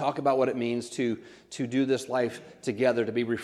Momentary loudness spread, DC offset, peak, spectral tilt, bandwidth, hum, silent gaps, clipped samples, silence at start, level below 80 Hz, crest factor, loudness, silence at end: 10 LU; under 0.1%; -10 dBFS; -5.5 dB/octave; 13 kHz; none; none; under 0.1%; 0 s; -72 dBFS; 18 dB; -28 LUFS; 0 s